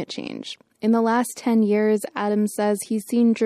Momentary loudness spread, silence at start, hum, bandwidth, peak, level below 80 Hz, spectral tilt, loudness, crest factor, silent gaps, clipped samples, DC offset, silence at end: 12 LU; 0 s; none; 15 kHz; -10 dBFS; -74 dBFS; -5.5 dB/octave; -22 LUFS; 12 dB; none; under 0.1%; under 0.1%; 0 s